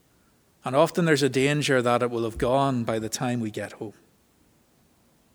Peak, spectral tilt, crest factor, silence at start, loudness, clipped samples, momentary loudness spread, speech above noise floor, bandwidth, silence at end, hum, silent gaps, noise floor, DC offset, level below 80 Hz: -6 dBFS; -5 dB/octave; 20 dB; 0.65 s; -24 LUFS; under 0.1%; 14 LU; 38 dB; over 20 kHz; 1.45 s; none; none; -62 dBFS; under 0.1%; -52 dBFS